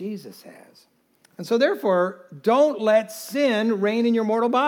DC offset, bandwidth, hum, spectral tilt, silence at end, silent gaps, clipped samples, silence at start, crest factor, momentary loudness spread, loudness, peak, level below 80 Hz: under 0.1%; 18.5 kHz; none; -5.5 dB/octave; 0 s; none; under 0.1%; 0 s; 14 dB; 13 LU; -21 LUFS; -8 dBFS; -88 dBFS